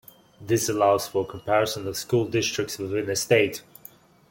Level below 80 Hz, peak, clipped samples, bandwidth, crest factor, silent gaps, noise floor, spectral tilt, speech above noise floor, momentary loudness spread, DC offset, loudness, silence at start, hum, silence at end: -60 dBFS; -6 dBFS; under 0.1%; 17 kHz; 20 dB; none; -51 dBFS; -4 dB/octave; 27 dB; 8 LU; under 0.1%; -24 LUFS; 0.4 s; none; 0.7 s